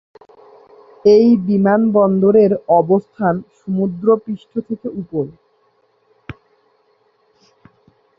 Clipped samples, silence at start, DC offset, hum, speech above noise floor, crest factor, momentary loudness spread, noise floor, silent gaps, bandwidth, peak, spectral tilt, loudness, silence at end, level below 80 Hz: under 0.1%; 1.05 s; under 0.1%; none; 45 dB; 16 dB; 14 LU; -60 dBFS; none; 6 kHz; -2 dBFS; -9.5 dB/octave; -15 LUFS; 1.85 s; -56 dBFS